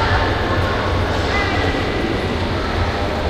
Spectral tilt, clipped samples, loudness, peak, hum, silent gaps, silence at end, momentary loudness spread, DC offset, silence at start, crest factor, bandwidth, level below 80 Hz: -6 dB/octave; under 0.1%; -19 LUFS; -4 dBFS; none; none; 0 s; 3 LU; under 0.1%; 0 s; 14 dB; 14 kHz; -28 dBFS